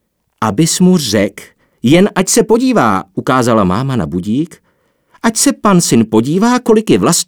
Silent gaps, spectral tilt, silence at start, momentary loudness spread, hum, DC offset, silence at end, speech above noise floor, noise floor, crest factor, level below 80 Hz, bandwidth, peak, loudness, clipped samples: none; -5 dB/octave; 0.4 s; 8 LU; none; under 0.1%; 0.05 s; 47 dB; -58 dBFS; 12 dB; -44 dBFS; over 20 kHz; 0 dBFS; -12 LUFS; under 0.1%